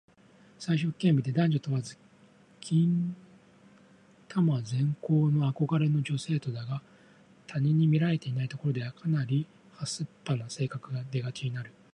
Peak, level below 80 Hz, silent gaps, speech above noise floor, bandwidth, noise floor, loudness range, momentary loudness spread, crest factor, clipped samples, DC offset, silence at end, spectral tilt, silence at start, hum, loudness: -14 dBFS; -70 dBFS; none; 31 dB; 10.5 kHz; -59 dBFS; 3 LU; 12 LU; 16 dB; under 0.1%; under 0.1%; 0.25 s; -7 dB/octave; 0.6 s; none; -30 LUFS